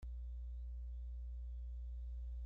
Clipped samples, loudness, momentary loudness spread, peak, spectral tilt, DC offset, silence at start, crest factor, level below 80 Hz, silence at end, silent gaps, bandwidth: under 0.1%; -50 LUFS; 1 LU; -42 dBFS; -9.5 dB/octave; under 0.1%; 0 s; 6 dB; -46 dBFS; 0 s; none; 0.8 kHz